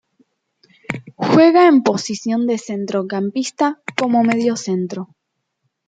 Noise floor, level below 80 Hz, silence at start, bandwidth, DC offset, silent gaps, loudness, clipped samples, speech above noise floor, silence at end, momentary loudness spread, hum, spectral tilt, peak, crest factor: -73 dBFS; -64 dBFS; 0.9 s; 9.2 kHz; under 0.1%; none; -17 LUFS; under 0.1%; 56 dB; 0.85 s; 17 LU; none; -5.5 dB/octave; -2 dBFS; 16 dB